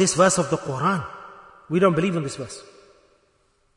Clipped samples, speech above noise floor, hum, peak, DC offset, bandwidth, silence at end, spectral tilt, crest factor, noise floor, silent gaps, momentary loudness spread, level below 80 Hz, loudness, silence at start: under 0.1%; 43 dB; none; -4 dBFS; under 0.1%; 11 kHz; 1.15 s; -4.5 dB/octave; 20 dB; -65 dBFS; none; 20 LU; -58 dBFS; -22 LUFS; 0 s